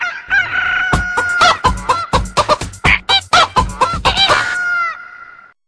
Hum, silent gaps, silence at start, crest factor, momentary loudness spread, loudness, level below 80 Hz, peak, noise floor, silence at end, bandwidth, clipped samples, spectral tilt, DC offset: none; none; 0 s; 14 dB; 6 LU; -13 LUFS; -28 dBFS; 0 dBFS; -39 dBFS; 0.35 s; 11 kHz; under 0.1%; -3 dB/octave; under 0.1%